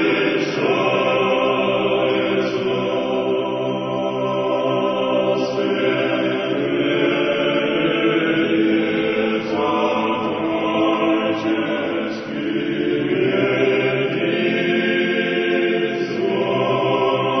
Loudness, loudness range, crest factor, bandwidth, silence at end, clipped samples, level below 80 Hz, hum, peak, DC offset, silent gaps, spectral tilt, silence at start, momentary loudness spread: -19 LUFS; 2 LU; 14 dB; 6.4 kHz; 0 s; under 0.1%; -60 dBFS; none; -4 dBFS; under 0.1%; none; -6.5 dB/octave; 0 s; 4 LU